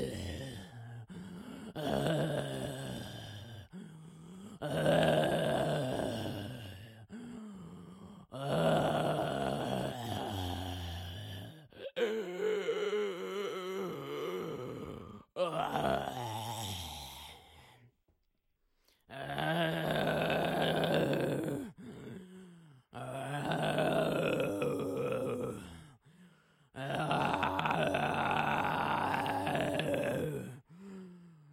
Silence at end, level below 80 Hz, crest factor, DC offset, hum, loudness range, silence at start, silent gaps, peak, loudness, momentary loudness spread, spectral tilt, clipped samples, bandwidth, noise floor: 0 s; -62 dBFS; 22 dB; under 0.1%; none; 6 LU; 0 s; none; -14 dBFS; -35 LUFS; 19 LU; -5.5 dB/octave; under 0.1%; 16.5 kHz; -78 dBFS